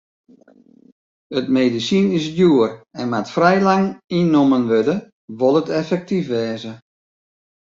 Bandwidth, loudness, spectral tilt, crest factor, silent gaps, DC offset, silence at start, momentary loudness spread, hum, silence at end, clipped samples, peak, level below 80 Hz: 7.6 kHz; -18 LUFS; -6.5 dB/octave; 16 dB; 4.04-4.08 s, 5.13-5.28 s; under 0.1%; 1.3 s; 11 LU; none; 0.95 s; under 0.1%; -2 dBFS; -60 dBFS